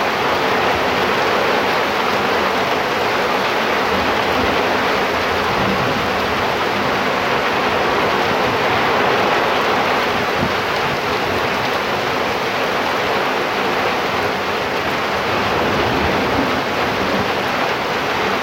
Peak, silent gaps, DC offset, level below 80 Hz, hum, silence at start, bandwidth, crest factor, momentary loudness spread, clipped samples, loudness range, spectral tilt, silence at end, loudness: -4 dBFS; none; under 0.1%; -42 dBFS; none; 0 s; 16 kHz; 14 dB; 3 LU; under 0.1%; 2 LU; -4 dB/octave; 0 s; -17 LUFS